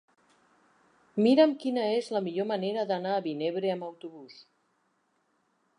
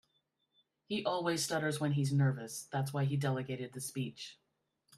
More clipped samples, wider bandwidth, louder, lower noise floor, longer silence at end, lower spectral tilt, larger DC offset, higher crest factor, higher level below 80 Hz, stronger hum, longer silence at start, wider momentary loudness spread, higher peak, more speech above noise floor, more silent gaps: neither; second, 10.5 kHz vs 14 kHz; first, -28 LUFS vs -35 LUFS; second, -73 dBFS vs -80 dBFS; first, 1.35 s vs 0.65 s; about the same, -6.5 dB/octave vs -5.5 dB/octave; neither; about the same, 20 dB vs 18 dB; second, -86 dBFS vs -76 dBFS; neither; first, 1.15 s vs 0.9 s; first, 18 LU vs 9 LU; first, -10 dBFS vs -20 dBFS; about the same, 45 dB vs 45 dB; neither